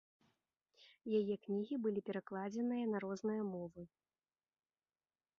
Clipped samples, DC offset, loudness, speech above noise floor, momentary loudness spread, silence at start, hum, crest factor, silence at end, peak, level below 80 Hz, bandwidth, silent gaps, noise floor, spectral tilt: under 0.1%; under 0.1%; -41 LUFS; over 50 dB; 13 LU; 0.8 s; none; 18 dB; 1.5 s; -26 dBFS; -84 dBFS; 6.8 kHz; none; under -90 dBFS; -7 dB/octave